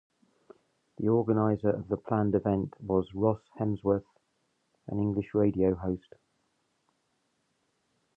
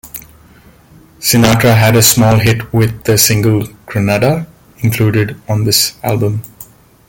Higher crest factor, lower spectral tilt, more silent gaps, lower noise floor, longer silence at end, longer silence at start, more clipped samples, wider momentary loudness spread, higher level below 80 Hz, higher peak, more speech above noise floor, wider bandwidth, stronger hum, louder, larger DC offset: first, 20 dB vs 12 dB; first, -11.5 dB/octave vs -4.5 dB/octave; neither; first, -76 dBFS vs -42 dBFS; first, 2.2 s vs 0.45 s; first, 1 s vs 0.05 s; neither; second, 7 LU vs 13 LU; second, -56 dBFS vs -38 dBFS; second, -12 dBFS vs 0 dBFS; first, 47 dB vs 32 dB; second, 3.7 kHz vs 17.5 kHz; neither; second, -29 LUFS vs -11 LUFS; neither